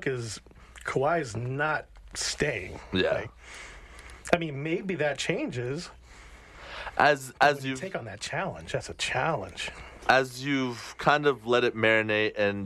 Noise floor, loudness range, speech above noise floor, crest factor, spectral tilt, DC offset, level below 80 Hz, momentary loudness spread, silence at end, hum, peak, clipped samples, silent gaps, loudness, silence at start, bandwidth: -50 dBFS; 5 LU; 22 dB; 22 dB; -4.5 dB/octave; under 0.1%; -54 dBFS; 17 LU; 0 s; none; -8 dBFS; under 0.1%; none; -28 LUFS; 0 s; 13 kHz